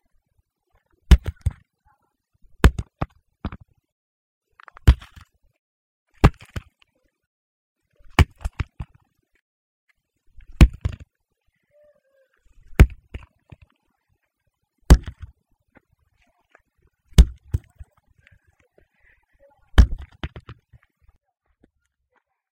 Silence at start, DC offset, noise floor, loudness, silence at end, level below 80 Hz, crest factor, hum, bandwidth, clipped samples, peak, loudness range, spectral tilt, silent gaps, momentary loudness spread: 1.1 s; under 0.1%; -75 dBFS; -21 LUFS; 2.25 s; -26 dBFS; 24 dB; none; 16 kHz; under 0.1%; 0 dBFS; 5 LU; -6.5 dB/octave; 3.92-4.41 s, 5.59-6.06 s, 7.27-7.76 s, 9.42-9.87 s; 21 LU